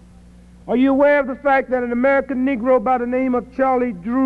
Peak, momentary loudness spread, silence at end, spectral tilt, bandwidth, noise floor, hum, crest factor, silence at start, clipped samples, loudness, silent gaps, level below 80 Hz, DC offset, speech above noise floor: -6 dBFS; 6 LU; 0 s; -8 dB/octave; 4.8 kHz; -44 dBFS; none; 12 dB; 0.65 s; under 0.1%; -18 LUFS; none; -46 dBFS; under 0.1%; 27 dB